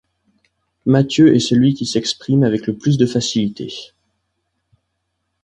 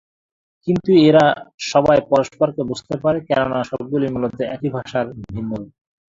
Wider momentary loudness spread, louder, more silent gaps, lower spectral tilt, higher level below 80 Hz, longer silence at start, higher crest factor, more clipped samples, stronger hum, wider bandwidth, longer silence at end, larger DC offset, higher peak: about the same, 12 LU vs 14 LU; about the same, -16 LUFS vs -18 LUFS; second, none vs 1.54-1.58 s; about the same, -6 dB/octave vs -6.5 dB/octave; about the same, -54 dBFS vs -50 dBFS; first, 0.85 s vs 0.65 s; about the same, 16 dB vs 18 dB; neither; neither; first, 10.5 kHz vs 7.8 kHz; first, 1.6 s vs 0.45 s; neither; about the same, -2 dBFS vs -2 dBFS